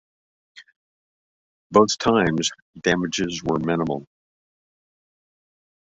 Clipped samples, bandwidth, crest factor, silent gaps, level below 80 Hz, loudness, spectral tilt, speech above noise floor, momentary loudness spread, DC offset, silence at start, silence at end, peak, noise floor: under 0.1%; 8.2 kHz; 22 dB; 0.76-1.70 s, 2.62-2.73 s; -54 dBFS; -22 LUFS; -4.5 dB/octave; over 69 dB; 8 LU; under 0.1%; 0.55 s; 1.85 s; -2 dBFS; under -90 dBFS